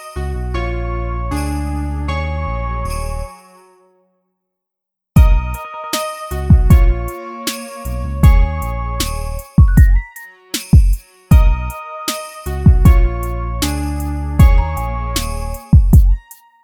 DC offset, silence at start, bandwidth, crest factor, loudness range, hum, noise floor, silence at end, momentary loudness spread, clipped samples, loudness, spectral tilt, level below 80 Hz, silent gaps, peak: under 0.1%; 0 s; 18 kHz; 14 dB; 7 LU; none; -81 dBFS; 0.45 s; 14 LU; under 0.1%; -16 LUFS; -6 dB/octave; -16 dBFS; none; 0 dBFS